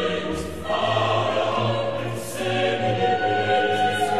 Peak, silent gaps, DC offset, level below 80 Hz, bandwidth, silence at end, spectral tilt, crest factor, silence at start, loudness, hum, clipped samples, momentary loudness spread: -8 dBFS; none; 0.9%; -50 dBFS; 13.5 kHz; 0 s; -5 dB/octave; 16 dB; 0 s; -23 LUFS; none; under 0.1%; 7 LU